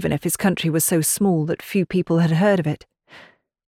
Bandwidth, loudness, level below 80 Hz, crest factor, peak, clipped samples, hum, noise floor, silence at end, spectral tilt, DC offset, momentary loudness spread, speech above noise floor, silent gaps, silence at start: 17 kHz; -20 LUFS; -54 dBFS; 14 dB; -6 dBFS; under 0.1%; none; -49 dBFS; 0.45 s; -5 dB/octave; under 0.1%; 6 LU; 30 dB; none; 0 s